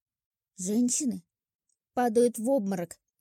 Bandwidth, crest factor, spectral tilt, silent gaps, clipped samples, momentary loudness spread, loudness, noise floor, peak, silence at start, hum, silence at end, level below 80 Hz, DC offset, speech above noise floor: 17 kHz; 16 dB; -4.5 dB/octave; 1.55-1.59 s; under 0.1%; 12 LU; -28 LUFS; -81 dBFS; -14 dBFS; 0.6 s; none; 0.35 s; -76 dBFS; under 0.1%; 54 dB